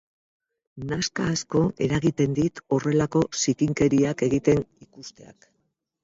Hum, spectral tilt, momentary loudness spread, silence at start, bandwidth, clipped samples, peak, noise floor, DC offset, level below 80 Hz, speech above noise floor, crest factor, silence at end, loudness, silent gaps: none; -5.5 dB/octave; 18 LU; 0.75 s; 7.8 kHz; under 0.1%; -6 dBFS; -75 dBFS; under 0.1%; -52 dBFS; 51 dB; 18 dB; 0.8 s; -24 LUFS; none